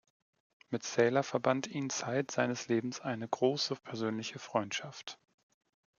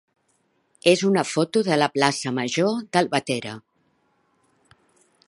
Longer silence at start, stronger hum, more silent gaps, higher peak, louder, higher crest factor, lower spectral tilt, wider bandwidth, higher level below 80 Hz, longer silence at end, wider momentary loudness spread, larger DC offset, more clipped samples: second, 0.7 s vs 0.85 s; neither; neither; second, -14 dBFS vs -2 dBFS; second, -34 LUFS vs -22 LUFS; about the same, 22 dB vs 24 dB; about the same, -4.5 dB/octave vs -4.5 dB/octave; second, 7.4 kHz vs 11.5 kHz; second, -82 dBFS vs -70 dBFS; second, 0.85 s vs 1.7 s; about the same, 10 LU vs 9 LU; neither; neither